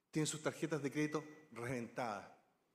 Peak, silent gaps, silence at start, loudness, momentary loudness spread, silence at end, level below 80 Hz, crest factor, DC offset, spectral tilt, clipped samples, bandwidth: -24 dBFS; none; 0.15 s; -42 LUFS; 10 LU; 0.4 s; -80 dBFS; 18 dB; under 0.1%; -5 dB/octave; under 0.1%; 15.5 kHz